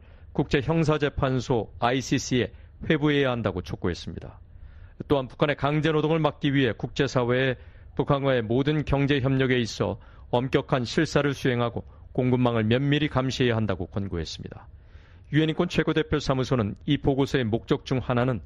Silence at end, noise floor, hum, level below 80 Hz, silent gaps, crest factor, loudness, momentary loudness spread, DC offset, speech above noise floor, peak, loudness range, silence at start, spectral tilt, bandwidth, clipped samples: 0 s; -49 dBFS; none; -44 dBFS; none; 18 dB; -25 LUFS; 9 LU; under 0.1%; 24 dB; -6 dBFS; 2 LU; 0 s; -6.5 dB/octave; 10.5 kHz; under 0.1%